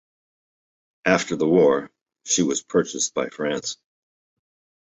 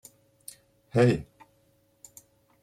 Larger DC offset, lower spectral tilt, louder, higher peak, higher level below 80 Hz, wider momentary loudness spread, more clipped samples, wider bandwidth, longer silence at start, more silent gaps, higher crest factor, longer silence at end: neither; second, -3.5 dB/octave vs -7 dB/octave; first, -22 LUFS vs -25 LUFS; first, -2 dBFS vs -10 dBFS; about the same, -62 dBFS vs -60 dBFS; second, 11 LU vs 27 LU; neither; second, 8.2 kHz vs 15 kHz; about the same, 1.05 s vs 0.95 s; first, 2.01-2.06 s vs none; about the same, 22 dB vs 22 dB; second, 1.1 s vs 1.4 s